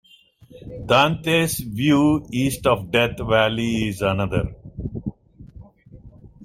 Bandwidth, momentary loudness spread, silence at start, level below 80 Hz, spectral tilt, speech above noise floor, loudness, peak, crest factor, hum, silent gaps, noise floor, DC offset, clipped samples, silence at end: 16 kHz; 15 LU; 0.55 s; -42 dBFS; -5 dB/octave; 31 dB; -20 LUFS; -2 dBFS; 20 dB; none; none; -51 dBFS; under 0.1%; under 0.1%; 0 s